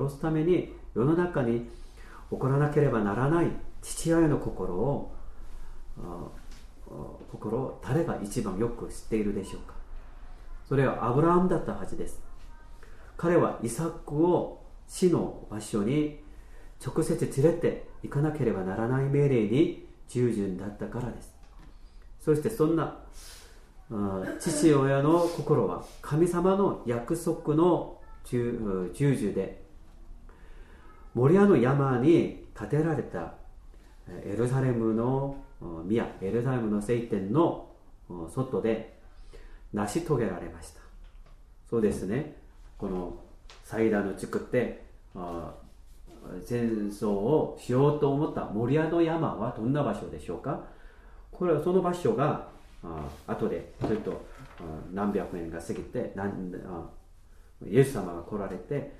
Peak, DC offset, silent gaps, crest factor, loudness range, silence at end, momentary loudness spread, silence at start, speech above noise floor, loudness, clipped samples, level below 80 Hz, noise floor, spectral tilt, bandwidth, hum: -8 dBFS; under 0.1%; none; 20 dB; 7 LU; 0 s; 18 LU; 0 s; 24 dB; -28 LUFS; under 0.1%; -46 dBFS; -52 dBFS; -7.5 dB/octave; 13.5 kHz; none